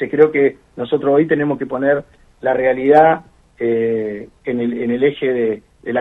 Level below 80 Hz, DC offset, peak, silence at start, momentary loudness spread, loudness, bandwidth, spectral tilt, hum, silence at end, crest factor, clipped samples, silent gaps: -54 dBFS; under 0.1%; 0 dBFS; 0 s; 11 LU; -17 LUFS; 4 kHz; -8.5 dB/octave; none; 0 s; 16 dB; under 0.1%; none